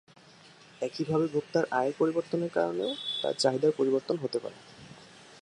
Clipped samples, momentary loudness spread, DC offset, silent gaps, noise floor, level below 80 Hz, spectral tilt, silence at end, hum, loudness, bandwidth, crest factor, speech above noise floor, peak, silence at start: under 0.1%; 21 LU; under 0.1%; none; -55 dBFS; -74 dBFS; -5 dB/octave; 0.05 s; none; -29 LUFS; 11 kHz; 20 dB; 26 dB; -12 dBFS; 0.8 s